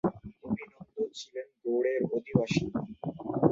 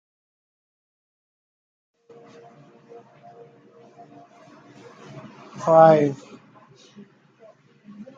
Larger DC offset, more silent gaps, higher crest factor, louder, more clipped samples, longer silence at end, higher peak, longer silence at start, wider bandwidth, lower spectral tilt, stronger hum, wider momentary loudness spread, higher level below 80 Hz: neither; neither; about the same, 22 dB vs 24 dB; second, -32 LUFS vs -17 LUFS; neither; second, 0 s vs 0.15 s; second, -8 dBFS vs -2 dBFS; second, 0.05 s vs 5.55 s; about the same, 7.8 kHz vs 7.6 kHz; about the same, -7 dB/octave vs -7.5 dB/octave; neither; second, 12 LU vs 29 LU; first, -60 dBFS vs -74 dBFS